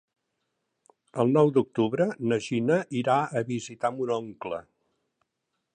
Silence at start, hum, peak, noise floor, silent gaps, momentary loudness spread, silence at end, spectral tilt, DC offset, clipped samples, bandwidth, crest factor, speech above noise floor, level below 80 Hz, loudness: 1.15 s; none; -10 dBFS; -81 dBFS; none; 14 LU; 1.15 s; -6.5 dB/octave; under 0.1%; under 0.1%; 9.6 kHz; 18 dB; 55 dB; -70 dBFS; -26 LUFS